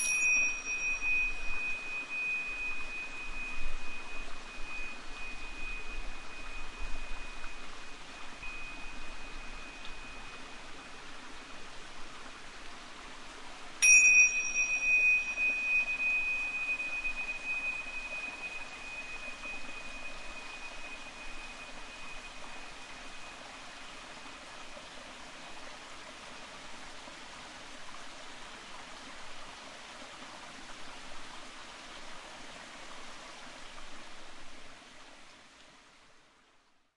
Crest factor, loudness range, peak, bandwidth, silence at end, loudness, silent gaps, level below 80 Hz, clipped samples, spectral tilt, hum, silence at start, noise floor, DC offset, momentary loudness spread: 24 dB; 22 LU; -12 dBFS; 11.5 kHz; 0.8 s; -30 LUFS; none; -48 dBFS; under 0.1%; 0 dB/octave; none; 0 s; -66 dBFS; under 0.1%; 20 LU